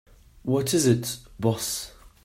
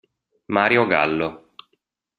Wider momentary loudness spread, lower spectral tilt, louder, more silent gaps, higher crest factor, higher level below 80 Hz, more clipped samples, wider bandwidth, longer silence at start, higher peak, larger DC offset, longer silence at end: first, 13 LU vs 9 LU; second, -5 dB/octave vs -7.5 dB/octave; second, -25 LUFS vs -20 LUFS; neither; about the same, 20 dB vs 22 dB; first, -54 dBFS vs -60 dBFS; neither; first, 16 kHz vs 10.5 kHz; about the same, 0.45 s vs 0.5 s; second, -8 dBFS vs -2 dBFS; neither; second, 0.15 s vs 0.8 s